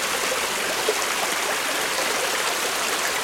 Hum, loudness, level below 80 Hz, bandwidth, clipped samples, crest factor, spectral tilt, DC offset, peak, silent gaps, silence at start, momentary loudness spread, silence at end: none; -22 LUFS; -60 dBFS; 16.5 kHz; under 0.1%; 16 dB; 0 dB/octave; under 0.1%; -8 dBFS; none; 0 s; 1 LU; 0 s